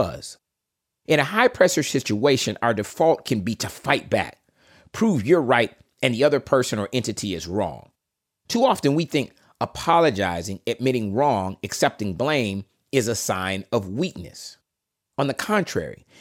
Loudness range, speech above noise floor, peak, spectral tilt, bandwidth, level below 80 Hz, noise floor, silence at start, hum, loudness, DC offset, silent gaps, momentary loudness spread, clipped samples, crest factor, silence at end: 4 LU; 61 dB; -2 dBFS; -4.5 dB/octave; 17 kHz; -58 dBFS; -83 dBFS; 0 s; none; -22 LUFS; under 0.1%; none; 12 LU; under 0.1%; 20 dB; 0.25 s